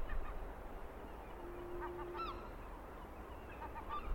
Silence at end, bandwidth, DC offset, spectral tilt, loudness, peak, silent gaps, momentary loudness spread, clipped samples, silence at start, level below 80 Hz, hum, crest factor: 0 s; 16.5 kHz; under 0.1%; -6.5 dB/octave; -49 LUFS; -28 dBFS; none; 7 LU; under 0.1%; 0 s; -50 dBFS; none; 16 dB